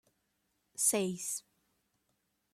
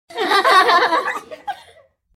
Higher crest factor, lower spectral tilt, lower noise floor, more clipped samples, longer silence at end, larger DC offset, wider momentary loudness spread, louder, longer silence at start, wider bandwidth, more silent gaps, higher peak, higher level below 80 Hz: first, 24 dB vs 18 dB; first, -3 dB/octave vs -1 dB/octave; first, -80 dBFS vs -51 dBFS; neither; first, 1.15 s vs 0.6 s; neither; second, 13 LU vs 19 LU; second, -33 LUFS vs -15 LUFS; first, 0.75 s vs 0.1 s; about the same, 16 kHz vs 16 kHz; neither; second, -16 dBFS vs 0 dBFS; second, -82 dBFS vs -68 dBFS